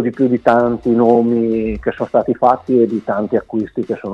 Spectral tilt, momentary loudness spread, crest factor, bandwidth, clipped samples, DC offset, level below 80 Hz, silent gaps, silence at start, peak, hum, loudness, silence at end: -9 dB/octave; 9 LU; 14 dB; 6 kHz; under 0.1%; under 0.1%; -42 dBFS; none; 0 s; 0 dBFS; none; -15 LUFS; 0 s